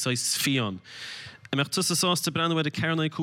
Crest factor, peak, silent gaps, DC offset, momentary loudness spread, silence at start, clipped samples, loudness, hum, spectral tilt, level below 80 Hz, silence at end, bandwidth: 16 dB; -10 dBFS; none; under 0.1%; 15 LU; 0 s; under 0.1%; -25 LUFS; none; -3.5 dB/octave; -68 dBFS; 0 s; 17 kHz